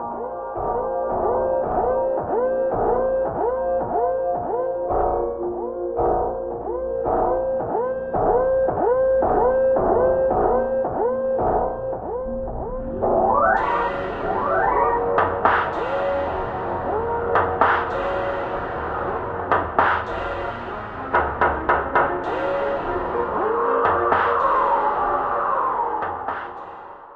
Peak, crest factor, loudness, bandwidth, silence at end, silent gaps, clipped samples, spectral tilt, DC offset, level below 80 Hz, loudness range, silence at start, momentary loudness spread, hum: -2 dBFS; 18 dB; -22 LUFS; 5.2 kHz; 0 s; none; under 0.1%; -8 dB/octave; under 0.1%; -40 dBFS; 4 LU; 0 s; 9 LU; none